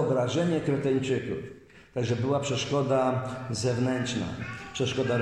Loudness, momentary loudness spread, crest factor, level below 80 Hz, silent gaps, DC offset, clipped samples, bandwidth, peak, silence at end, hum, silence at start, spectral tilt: -28 LUFS; 10 LU; 14 dB; -58 dBFS; none; under 0.1%; under 0.1%; 11 kHz; -14 dBFS; 0 s; none; 0 s; -5.5 dB/octave